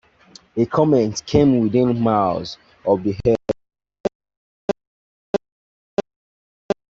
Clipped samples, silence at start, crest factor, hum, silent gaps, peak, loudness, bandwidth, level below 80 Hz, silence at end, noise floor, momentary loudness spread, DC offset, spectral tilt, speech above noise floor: under 0.1%; 0.55 s; 18 dB; none; 4.00-4.04 s, 4.15-4.20 s, 4.37-4.68 s, 4.87-5.33 s, 5.52-5.97 s, 6.16-6.69 s; -2 dBFS; -21 LUFS; 7.8 kHz; -48 dBFS; 0.2 s; -49 dBFS; 12 LU; under 0.1%; -7 dB/octave; 32 dB